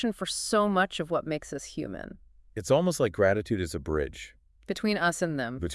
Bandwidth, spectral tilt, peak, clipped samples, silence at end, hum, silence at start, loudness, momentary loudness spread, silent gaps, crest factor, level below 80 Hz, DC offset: 12 kHz; -4.5 dB/octave; -10 dBFS; under 0.1%; 0 s; none; 0 s; -28 LUFS; 14 LU; none; 18 dB; -50 dBFS; under 0.1%